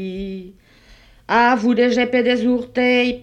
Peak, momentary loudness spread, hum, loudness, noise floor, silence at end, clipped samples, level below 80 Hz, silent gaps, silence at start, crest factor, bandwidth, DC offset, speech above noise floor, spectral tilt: -2 dBFS; 14 LU; none; -17 LUFS; -48 dBFS; 0 s; under 0.1%; -50 dBFS; none; 0 s; 16 dB; 8 kHz; under 0.1%; 31 dB; -5.5 dB/octave